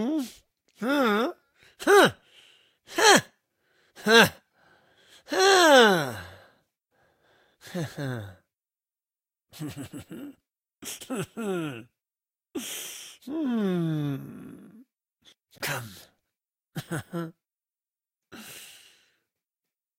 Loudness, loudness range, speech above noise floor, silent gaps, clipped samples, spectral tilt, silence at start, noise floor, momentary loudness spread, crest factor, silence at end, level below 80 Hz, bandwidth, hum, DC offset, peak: -24 LUFS; 19 LU; over 64 dB; none; under 0.1%; -3.5 dB/octave; 0 s; under -90 dBFS; 25 LU; 26 dB; 1.35 s; -70 dBFS; 16 kHz; none; under 0.1%; -2 dBFS